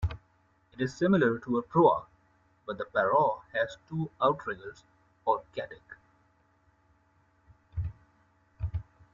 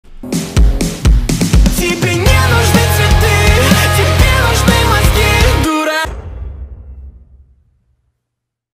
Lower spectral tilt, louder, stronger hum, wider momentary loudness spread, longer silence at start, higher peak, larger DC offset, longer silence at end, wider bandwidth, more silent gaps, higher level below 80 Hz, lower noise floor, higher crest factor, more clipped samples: first, -7.5 dB/octave vs -4.5 dB/octave; second, -30 LUFS vs -11 LUFS; neither; first, 17 LU vs 12 LU; about the same, 0 s vs 0.1 s; second, -10 dBFS vs 0 dBFS; neither; second, 0.3 s vs 1.65 s; second, 7.6 kHz vs 16.5 kHz; neither; second, -50 dBFS vs -16 dBFS; second, -68 dBFS vs -76 dBFS; first, 22 dB vs 12 dB; neither